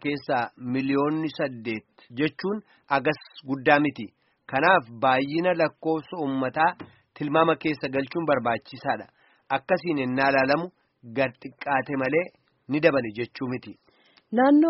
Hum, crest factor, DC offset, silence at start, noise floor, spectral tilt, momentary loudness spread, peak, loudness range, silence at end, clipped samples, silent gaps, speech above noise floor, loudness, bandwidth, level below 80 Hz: none; 22 dB; under 0.1%; 0.05 s; -50 dBFS; -4 dB/octave; 12 LU; -2 dBFS; 3 LU; 0 s; under 0.1%; none; 25 dB; -25 LUFS; 5.8 kHz; -66 dBFS